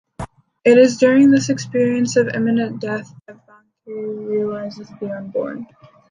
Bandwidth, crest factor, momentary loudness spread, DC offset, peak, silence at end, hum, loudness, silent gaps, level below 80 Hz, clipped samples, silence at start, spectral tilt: 9.8 kHz; 16 dB; 20 LU; under 0.1%; -2 dBFS; 0.45 s; none; -17 LUFS; none; -54 dBFS; under 0.1%; 0.2 s; -5.5 dB/octave